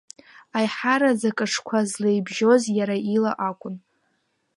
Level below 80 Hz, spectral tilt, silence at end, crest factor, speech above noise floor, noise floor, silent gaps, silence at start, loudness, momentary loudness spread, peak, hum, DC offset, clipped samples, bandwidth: -76 dBFS; -4.5 dB/octave; 0.8 s; 18 dB; 49 dB; -71 dBFS; none; 0.55 s; -22 LUFS; 10 LU; -6 dBFS; none; under 0.1%; under 0.1%; 11.5 kHz